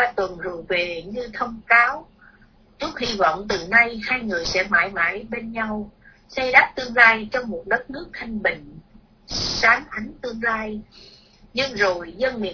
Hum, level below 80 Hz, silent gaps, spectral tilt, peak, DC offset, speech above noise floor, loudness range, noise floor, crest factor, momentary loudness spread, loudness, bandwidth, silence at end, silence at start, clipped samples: none; -48 dBFS; none; -3 dB/octave; 0 dBFS; under 0.1%; 31 dB; 4 LU; -53 dBFS; 22 dB; 16 LU; -20 LUFS; 5.4 kHz; 0 s; 0 s; under 0.1%